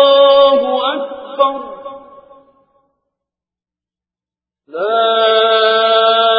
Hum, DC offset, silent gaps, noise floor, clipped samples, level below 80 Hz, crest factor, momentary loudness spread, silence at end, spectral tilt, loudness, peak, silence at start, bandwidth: 60 Hz at -80 dBFS; under 0.1%; none; -89 dBFS; under 0.1%; -62 dBFS; 14 dB; 20 LU; 0 s; -7 dB/octave; -12 LUFS; 0 dBFS; 0 s; 5 kHz